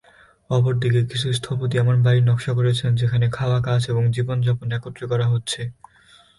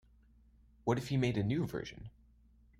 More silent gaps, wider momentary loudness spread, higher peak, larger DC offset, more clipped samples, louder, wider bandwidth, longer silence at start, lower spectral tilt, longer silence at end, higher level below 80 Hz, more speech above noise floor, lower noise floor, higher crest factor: neither; second, 8 LU vs 17 LU; first, -8 dBFS vs -18 dBFS; neither; neither; first, -21 LUFS vs -36 LUFS; second, 11.5 kHz vs 15.5 kHz; second, 0.5 s vs 0.85 s; about the same, -6.5 dB/octave vs -7 dB/octave; about the same, 0.65 s vs 0.7 s; first, -50 dBFS vs -60 dBFS; first, 34 dB vs 30 dB; second, -53 dBFS vs -65 dBFS; second, 12 dB vs 20 dB